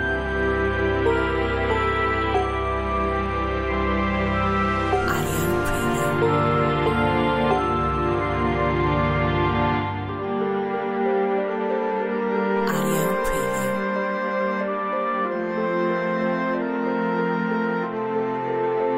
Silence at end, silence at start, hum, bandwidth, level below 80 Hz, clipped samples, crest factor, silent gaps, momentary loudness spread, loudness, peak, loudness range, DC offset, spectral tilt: 0 s; 0 s; none; 16 kHz; -36 dBFS; under 0.1%; 14 dB; none; 4 LU; -23 LUFS; -8 dBFS; 3 LU; under 0.1%; -6 dB/octave